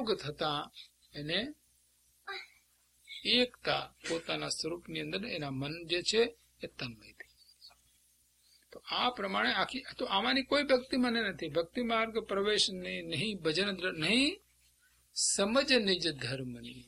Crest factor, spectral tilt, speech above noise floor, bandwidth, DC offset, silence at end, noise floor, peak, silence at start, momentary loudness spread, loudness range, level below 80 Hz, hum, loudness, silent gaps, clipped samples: 22 dB; -3 dB/octave; 37 dB; 15 kHz; under 0.1%; 0.05 s; -70 dBFS; -14 dBFS; 0 s; 16 LU; 6 LU; -64 dBFS; 60 Hz at -65 dBFS; -32 LUFS; none; under 0.1%